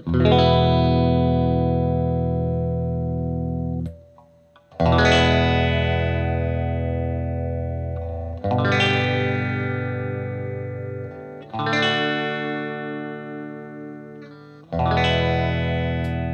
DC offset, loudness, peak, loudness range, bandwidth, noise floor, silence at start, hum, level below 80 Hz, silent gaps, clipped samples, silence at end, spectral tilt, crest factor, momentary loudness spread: under 0.1%; -22 LUFS; -4 dBFS; 5 LU; 8.4 kHz; -53 dBFS; 0 s; none; -38 dBFS; none; under 0.1%; 0 s; -7 dB/octave; 18 dB; 16 LU